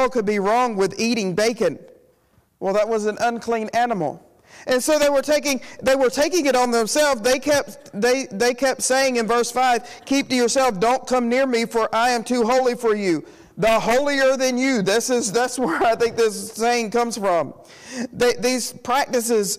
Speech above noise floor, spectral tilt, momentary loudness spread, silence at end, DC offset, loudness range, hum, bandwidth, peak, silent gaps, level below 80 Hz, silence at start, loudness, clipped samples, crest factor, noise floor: 40 dB; -3 dB/octave; 5 LU; 0 s; under 0.1%; 3 LU; none; 15.5 kHz; -10 dBFS; none; -54 dBFS; 0 s; -20 LUFS; under 0.1%; 10 dB; -60 dBFS